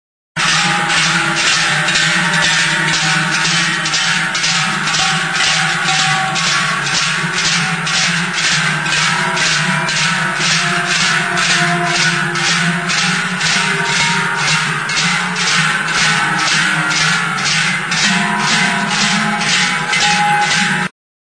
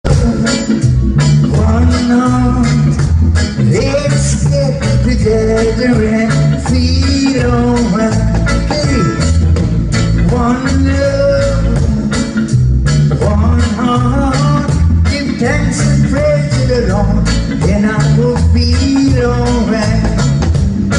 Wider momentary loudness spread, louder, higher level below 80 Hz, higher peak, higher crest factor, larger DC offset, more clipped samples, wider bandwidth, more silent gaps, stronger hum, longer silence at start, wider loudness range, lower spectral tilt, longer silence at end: about the same, 2 LU vs 2 LU; about the same, -13 LUFS vs -12 LUFS; second, -50 dBFS vs -18 dBFS; about the same, -2 dBFS vs 0 dBFS; about the same, 14 dB vs 10 dB; first, 0.3% vs under 0.1%; neither; about the same, 11 kHz vs 11 kHz; neither; neither; first, 0.35 s vs 0.05 s; about the same, 1 LU vs 1 LU; second, -2 dB/octave vs -6.5 dB/octave; first, 0.35 s vs 0 s